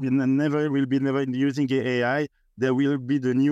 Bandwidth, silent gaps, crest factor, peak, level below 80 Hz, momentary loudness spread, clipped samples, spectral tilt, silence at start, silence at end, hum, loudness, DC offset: 7.8 kHz; none; 12 dB; -12 dBFS; -70 dBFS; 3 LU; under 0.1%; -7.5 dB/octave; 0 s; 0 s; none; -24 LUFS; under 0.1%